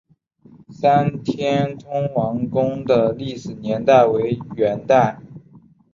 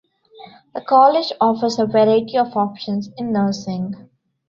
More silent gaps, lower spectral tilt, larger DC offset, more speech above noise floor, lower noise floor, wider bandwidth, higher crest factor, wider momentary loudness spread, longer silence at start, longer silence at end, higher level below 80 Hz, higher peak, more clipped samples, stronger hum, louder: neither; about the same, -7.5 dB/octave vs -6.5 dB/octave; neither; first, 32 dB vs 26 dB; first, -51 dBFS vs -44 dBFS; about the same, 7.4 kHz vs 7.4 kHz; about the same, 18 dB vs 16 dB; second, 10 LU vs 15 LU; first, 0.7 s vs 0.4 s; about the same, 0.35 s vs 0.45 s; first, -54 dBFS vs -62 dBFS; about the same, -2 dBFS vs -2 dBFS; neither; neither; about the same, -19 LUFS vs -18 LUFS